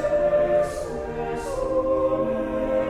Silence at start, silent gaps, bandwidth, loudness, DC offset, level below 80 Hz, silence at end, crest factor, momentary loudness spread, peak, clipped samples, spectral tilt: 0 s; none; 13.5 kHz; -24 LUFS; under 0.1%; -40 dBFS; 0 s; 12 dB; 9 LU; -12 dBFS; under 0.1%; -6.5 dB/octave